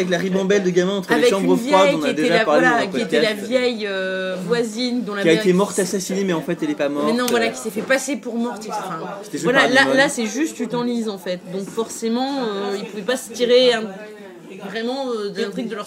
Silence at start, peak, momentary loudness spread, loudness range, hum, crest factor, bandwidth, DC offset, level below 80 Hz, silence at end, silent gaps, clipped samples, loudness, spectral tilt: 0 s; 0 dBFS; 12 LU; 5 LU; none; 20 dB; 16 kHz; under 0.1%; -66 dBFS; 0 s; none; under 0.1%; -19 LUFS; -4 dB/octave